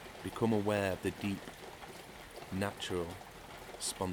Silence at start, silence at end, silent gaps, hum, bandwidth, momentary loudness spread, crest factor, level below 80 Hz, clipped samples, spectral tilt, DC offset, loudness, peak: 0 s; 0 s; none; none; over 20 kHz; 16 LU; 20 dB; -62 dBFS; under 0.1%; -4.5 dB/octave; under 0.1%; -37 LUFS; -18 dBFS